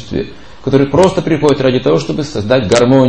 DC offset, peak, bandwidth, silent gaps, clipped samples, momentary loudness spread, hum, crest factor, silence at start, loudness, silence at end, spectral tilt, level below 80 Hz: 2%; 0 dBFS; 11 kHz; none; 0.1%; 12 LU; none; 12 dB; 0 s; -12 LUFS; 0 s; -6 dB/octave; -38 dBFS